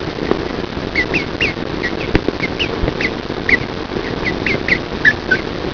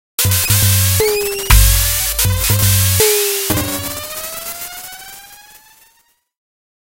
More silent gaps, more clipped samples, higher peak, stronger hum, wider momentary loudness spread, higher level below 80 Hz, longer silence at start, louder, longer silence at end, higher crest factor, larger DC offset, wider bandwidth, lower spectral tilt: neither; neither; about the same, -2 dBFS vs 0 dBFS; neither; second, 7 LU vs 16 LU; second, -32 dBFS vs -22 dBFS; second, 0 s vs 0.2 s; second, -17 LUFS vs -13 LUFS; second, 0 s vs 1.65 s; about the same, 16 dB vs 16 dB; neither; second, 5.4 kHz vs 17 kHz; first, -5.5 dB/octave vs -3 dB/octave